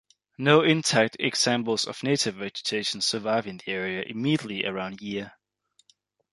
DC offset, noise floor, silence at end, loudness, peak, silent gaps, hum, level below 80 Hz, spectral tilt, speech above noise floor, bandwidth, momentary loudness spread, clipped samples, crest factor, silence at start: under 0.1%; -68 dBFS; 1.05 s; -25 LUFS; -4 dBFS; none; none; -68 dBFS; -3.5 dB/octave; 42 dB; 11.5 kHz; 12 LU; under 0.1%; 22 dB; 0.4 s